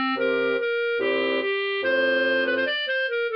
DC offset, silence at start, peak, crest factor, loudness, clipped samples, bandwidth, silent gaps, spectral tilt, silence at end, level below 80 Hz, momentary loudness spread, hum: under 0.1%; 0 s; -12 dBFS; 12 dB; -23 LUFS; under 0.1%; 5.6 kHz; none; -5.5 dB/octave; 0 s; -74 dBFS; 3 LU; none